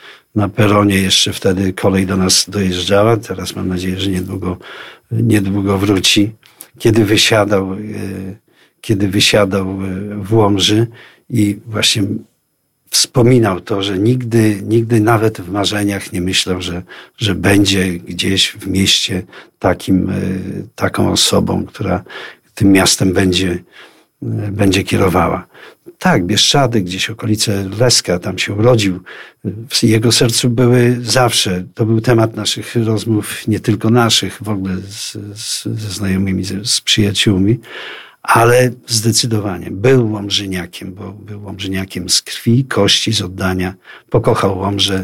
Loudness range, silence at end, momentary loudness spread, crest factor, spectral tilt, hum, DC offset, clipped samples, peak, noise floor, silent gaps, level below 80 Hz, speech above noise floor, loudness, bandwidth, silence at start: 3 LU; 0 s; 13 LU; 14 dB; -4.5 dB/octave; none; under 0.1%; under 0.1%; 0 dBFS; -64 dBFS; none; -44 dBFS; 50 dB; -14 LUFS; 16.5 kHz; 0.05 s